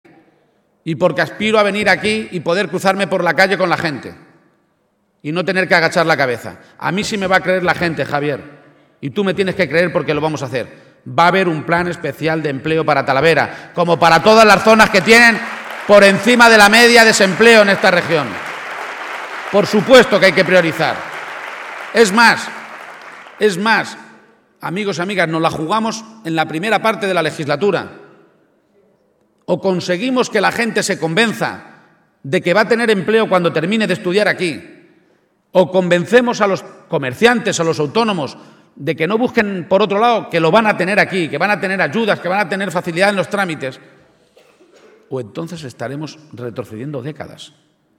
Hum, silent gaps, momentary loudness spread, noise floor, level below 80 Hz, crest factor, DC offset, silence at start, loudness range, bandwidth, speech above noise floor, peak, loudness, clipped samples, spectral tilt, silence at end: none; none; 18 LU; -62 dBFS; -52 dBFS; 16 dB; under 0.1%; 0.85 s; 10 LU; 19.5 kHz; 48 dB; 0 dBFS; -14 LUFS; 0.1%; -4.5 dB/octave; 0.5 s